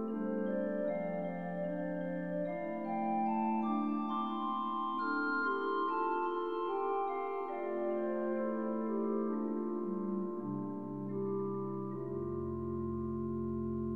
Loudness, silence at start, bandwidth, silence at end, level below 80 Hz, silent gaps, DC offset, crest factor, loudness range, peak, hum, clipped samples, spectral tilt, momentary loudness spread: -37 LUFS; 0 s; 4.5 kHz; 0 s; -68 dBFS; none; 0.2%; 14 dB; 4 LU; -22 dBFS; none; under 0.1%; -9.5 dB/octave; 5 LU